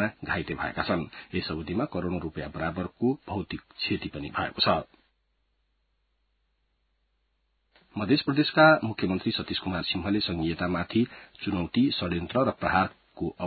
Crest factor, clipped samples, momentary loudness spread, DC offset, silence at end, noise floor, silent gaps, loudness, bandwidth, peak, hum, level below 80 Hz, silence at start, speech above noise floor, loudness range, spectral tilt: 22 dB; under 0.1%; 9 LU; under 0.1%; 0 s; -74 dBFS; none; -28 LUFS; 4.8 kHz; -6 dBFS; none; -50 dBFS; 0 s; 46 dB; 8 LU; -10 dB/octave